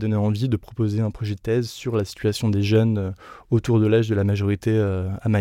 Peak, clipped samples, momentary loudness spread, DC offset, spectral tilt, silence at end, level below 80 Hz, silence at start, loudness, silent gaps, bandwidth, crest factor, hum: -6 dBFS; under 0.1%; 7 LU; under 0.1%; -7.5 dB/octave; 0 s; -48 dBFS; 0 s; -22 LUFS; none; 13 kHz; 16 dB; none